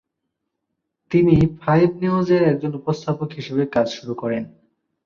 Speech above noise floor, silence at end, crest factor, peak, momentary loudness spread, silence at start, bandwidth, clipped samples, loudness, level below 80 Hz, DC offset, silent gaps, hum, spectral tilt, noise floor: 59 dB; 0.6 s; 18 dB; -2 dBFS; 10 LU; 1.1 s; 7.2 kHz; under 0.1%; -20 LUFS; -46 dBFS; under 0.1%; none; none; -8 dB/octave; -78 dBFS